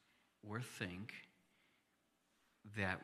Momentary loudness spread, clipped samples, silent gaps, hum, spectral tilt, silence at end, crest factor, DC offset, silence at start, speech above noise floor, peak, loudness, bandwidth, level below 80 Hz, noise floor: 20 LU; under 0.1%; none; none; -5 dB/octave; 0 s; 26 dB; under 0.1%; 0.45 s; 35 dB; -24 dBFS; -48 LUFS; 15 kHz; -82 dBFS; -81 dBFS